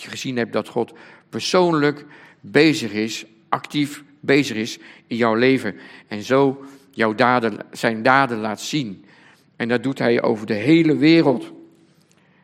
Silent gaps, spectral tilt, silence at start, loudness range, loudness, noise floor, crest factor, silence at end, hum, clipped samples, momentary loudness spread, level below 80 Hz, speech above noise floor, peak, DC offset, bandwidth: none; -5.5 dB/octave; 0 s; 2 LU; -19 LUFS; -56 dBFS; 20 dB; 0.8 s; none; under 0.1%; 15 LU; -68 dBFS; 37 dB; 0 dBFS; under 0.1%; 15 kHz